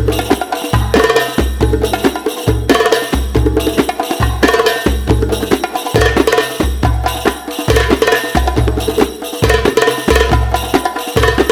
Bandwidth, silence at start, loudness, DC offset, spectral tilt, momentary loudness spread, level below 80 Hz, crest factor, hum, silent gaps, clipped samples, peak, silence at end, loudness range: 18 kHz; 0 s; -14 LUFS; under 0.1%; -5 dB/octave; 5 LU; -20 dBFS; 12 dB; none; none; under 0.1%; 0 dBFS; 0 s; 1 LU